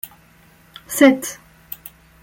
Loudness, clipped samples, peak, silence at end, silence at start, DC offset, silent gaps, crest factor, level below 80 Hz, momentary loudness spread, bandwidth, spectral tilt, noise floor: -16 LUFS; under 0.1%; -2 dBFS; 0.9 s; 0.9 s; under 0.1%; none; 20 dB; -58 dBFS; 25 LU; 17 kHz; -3 dB/octave; -51 dBFS